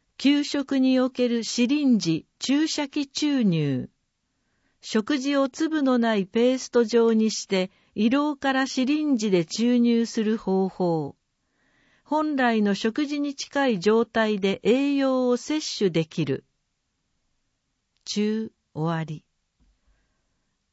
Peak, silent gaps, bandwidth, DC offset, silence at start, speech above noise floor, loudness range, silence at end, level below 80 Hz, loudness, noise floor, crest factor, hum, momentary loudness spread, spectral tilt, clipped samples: -8 dBFS; none; 8 kHz; under 0.1%; 0.2 s; 52 dB; 8 LU; 1.55 s; -68 dBFS; -24 LUFS; -76 dBFS; 16 dB; none; 7 LU; -5 dB/octave; under 0.1%